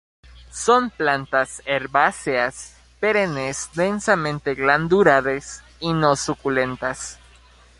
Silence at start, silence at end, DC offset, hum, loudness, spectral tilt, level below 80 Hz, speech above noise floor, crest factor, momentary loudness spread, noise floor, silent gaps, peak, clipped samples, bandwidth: 0.35 s; 0.65 s; under 0.1%; none; -20 LUFS; -4.5 dB/octave; -50 dBFS; 30 dB; 20 dB; 12 LU; -50 dBFS; none; -2 dBFS; under 0.1%; 11.5 kHz